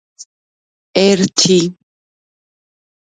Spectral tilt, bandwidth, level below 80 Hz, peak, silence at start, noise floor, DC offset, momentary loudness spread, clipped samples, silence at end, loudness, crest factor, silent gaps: -4 dB/octave; 9.6 kHz; -58 dBFS; 0 dBFS; 0.2 s; under -90 dBFS; under 0.1%; 9 LU; under 0.1%; 1.4 s; -13 LUFS; 18 dB; 0.25-0.94 s